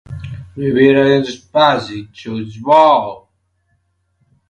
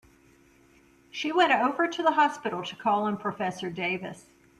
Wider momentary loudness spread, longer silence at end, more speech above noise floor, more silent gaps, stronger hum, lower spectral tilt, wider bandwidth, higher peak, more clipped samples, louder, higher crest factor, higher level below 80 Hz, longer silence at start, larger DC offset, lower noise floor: first, 19 LU vs 11 LU; first, 1.3 s vs 0.4 s; first, 50 dB vs 32 dB; neither; neither; first, -6.5 dB/octave vs -4.5 dB/octave; second, 9 kHz vs 13 kHz; first, 0 dBFS vs -10 dBFS; neither; first, -13 LUFS vs -27 LUFS; about the same, 16 dB vs 20 dB; first, -48 dBFS vs -70 dBFS; second, 0.1 s vs 1.15 s; neither; first, -63 dBFS vs -59 dBFS